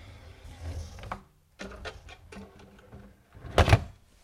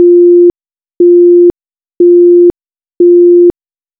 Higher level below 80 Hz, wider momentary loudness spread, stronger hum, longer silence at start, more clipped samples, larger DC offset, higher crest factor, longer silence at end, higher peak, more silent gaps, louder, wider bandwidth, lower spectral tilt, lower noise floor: first, -40 dBFS vs -46 dBFS; first, 27 LU vs 6 LU; neither; about the same, 0 s vs 0 s; neither; neither; first, 28 dB vs 6 dB; second, 0.3 s vs 0.5 s; second, -4 dBFS vs 0 dBFS; neither; second, -29 LUFS vs -6 LUFS; first, 15 kHz vs 1 kHz; second, -5.5 dB/octave vs -11 dB/octave; second, -52 dBFS vs under -90 dBFS